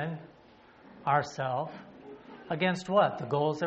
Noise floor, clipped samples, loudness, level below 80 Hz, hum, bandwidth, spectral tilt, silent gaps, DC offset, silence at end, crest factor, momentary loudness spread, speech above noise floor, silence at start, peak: -57 dBFS; under 0.1%; -30 LUFS; -70 dBFS; none; 8 kHz; -4.5 dB/octave; none; under 0.1%; 0 s; 20 dB; 22 LU; 27 dB; 0 s; -12 dBFS